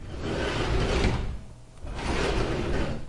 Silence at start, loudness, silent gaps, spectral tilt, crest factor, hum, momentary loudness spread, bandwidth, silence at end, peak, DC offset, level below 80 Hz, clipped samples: 0 s; -29 LUFS; none; -5.5 dB/octave; 16 dB; none; 15 LU; 11.5 kHz; 0 s; -12 dBFS; under 0.1%; -32 dBFS; under 0.1%